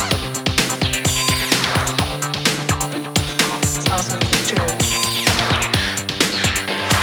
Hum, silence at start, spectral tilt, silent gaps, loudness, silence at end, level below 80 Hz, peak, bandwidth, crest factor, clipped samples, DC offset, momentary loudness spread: none; 0 s; -3 dB/octave; none; -18 LUFS; 0 s; -36 dBFS; 0 dBFS; over 20 kHz; 18 dB; under 0.1%; under 0.1%; 4 LU